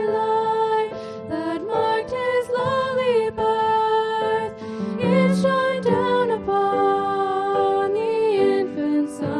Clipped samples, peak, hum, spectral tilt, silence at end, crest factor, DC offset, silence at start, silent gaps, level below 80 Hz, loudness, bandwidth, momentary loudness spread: under 0.1%; -6 dBFS; none; -6.5 dB/octave; 0 s; 14 dB; under 0.1%; 0 s; none; -56 dBFS; -21 LUFS; 11.5 kHz; 7 LU